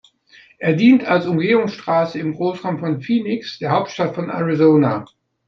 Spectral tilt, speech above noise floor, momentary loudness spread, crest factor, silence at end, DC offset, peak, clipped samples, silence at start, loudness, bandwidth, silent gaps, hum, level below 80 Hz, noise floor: -7.5 dB/octave; 33 dB; 10 LU; 16 dB; 0.45 s; under 0.1%; -2 dBFS; under 0.1%; 0.6 s; -18 LUFS; 6.8 kHz; none; none; -62 dBFS; -50 dBFS